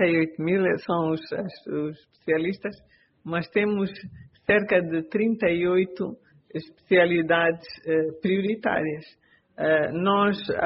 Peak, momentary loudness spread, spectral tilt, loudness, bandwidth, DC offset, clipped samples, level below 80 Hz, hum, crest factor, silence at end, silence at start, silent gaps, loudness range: -6 dBFS; 14 LU; -4.5 dB/octave; -25 LUFS; 5.8 kHz; under 0.1%; under 0.1%; -62 dBFS; none; 18 dB; 0 s; 0 s; none; 4 LU